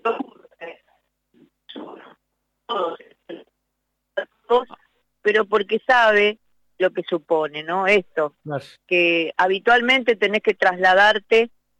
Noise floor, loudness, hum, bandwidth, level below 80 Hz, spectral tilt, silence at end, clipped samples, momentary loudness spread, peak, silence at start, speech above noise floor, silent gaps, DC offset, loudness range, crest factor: -76 dBFS; -19 LUFS; none; 10.5 kHz; -62 dBFS; -4.5 dB/octave; 0.3 s; under 0.1%; 24 LU; -6 dBFS; 0.05 s; 57 dB; none; under 0.1%; 16 LU; 16 dB